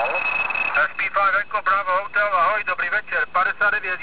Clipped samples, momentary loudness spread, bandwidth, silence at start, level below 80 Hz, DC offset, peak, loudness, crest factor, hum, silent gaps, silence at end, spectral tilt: under 0.1%; 3 LU; 4 kHz; 0 s; -58 dBFS; 1%; -8 dBFS; -20 LUFS; 14 dB; none; none; 0 s; -5.5 dB/octave